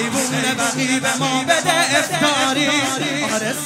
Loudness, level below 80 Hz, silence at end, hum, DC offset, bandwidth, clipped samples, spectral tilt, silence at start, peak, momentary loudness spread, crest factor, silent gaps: -17 LUFS; -64 dBFS; 0 s; none; under 0.1%; 16 kHz; under 0.1%; -2.5 dB/octave; 0 s; -2 dBFS; 4 LU; 16 dB; none